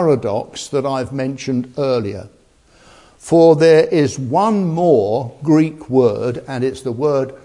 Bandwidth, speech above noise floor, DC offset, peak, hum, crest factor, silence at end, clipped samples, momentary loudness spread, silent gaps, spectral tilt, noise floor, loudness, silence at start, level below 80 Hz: 11.5 kHz; 35 dB; under 0.1%; 0 dBFS; none; 16 dB; 0.05 s; under 0.1%; 11 LU; none; -7 dB/octave; -51 dBFS; -16 LUFS; 0 s; -54 dBFS